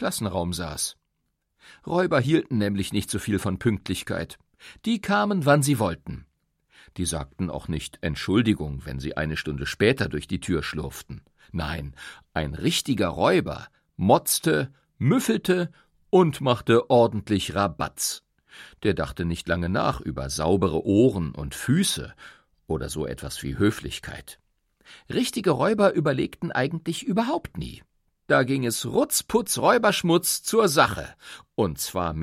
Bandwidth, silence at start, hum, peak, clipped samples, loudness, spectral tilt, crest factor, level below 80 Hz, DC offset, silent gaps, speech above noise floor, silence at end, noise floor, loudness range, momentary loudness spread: 16.5 kHz; 0 s; none; -4 dBFS; under 0.1%; -24 LUFS; -5 dB/octave; 20 dB; -46 dBFS; under 0.1%; none; 52 dB; 0 s; -76 dBFS; 6 LU; 14 LU